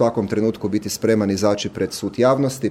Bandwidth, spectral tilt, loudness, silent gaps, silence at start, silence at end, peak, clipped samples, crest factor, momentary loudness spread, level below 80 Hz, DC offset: 16.5 kHz; -5.5 dB/octave; -20 LUFS; none; 0 s; 0 s; -4 dBFS; under 0.1%; 16 dB; 7 LU; -54 dBFS; under 0.1%